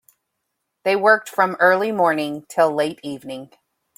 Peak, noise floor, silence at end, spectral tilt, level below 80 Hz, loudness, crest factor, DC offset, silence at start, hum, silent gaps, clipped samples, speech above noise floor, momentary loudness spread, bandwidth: -2 dBFS; -77 dBFS; 0.55 s; -4.5 dB/octave; -70 dBFS; -18 LUFS; 18 dB; under 0.1%; 0.85 s; none; none; under 0.1%; 58 dB; 16 LU; 16.5 kHz